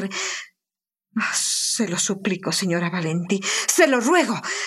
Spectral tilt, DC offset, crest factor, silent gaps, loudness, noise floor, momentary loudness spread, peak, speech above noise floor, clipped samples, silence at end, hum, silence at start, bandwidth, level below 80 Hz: -3 dB/octave; under 0.1%; 20 dB; none; -21 LUFS; -90 dBFS; 9 LU; -2 dBFS; 68 dB; under 0.1%; 0 s; none; 0 s; 15 kHz; -74 dBFS